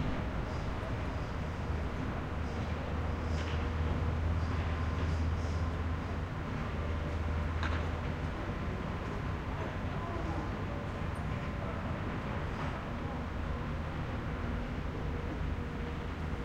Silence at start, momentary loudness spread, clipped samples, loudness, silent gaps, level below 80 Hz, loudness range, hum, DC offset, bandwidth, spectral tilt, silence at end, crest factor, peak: 0 s; 4 LU; under 0.1%; -37 LUFS; none; -42 dBFS; 3 LU; none; under 0.1%; 8.8 kHz; -7 dB/octave; 0 s; 14 dB; -22 dBFS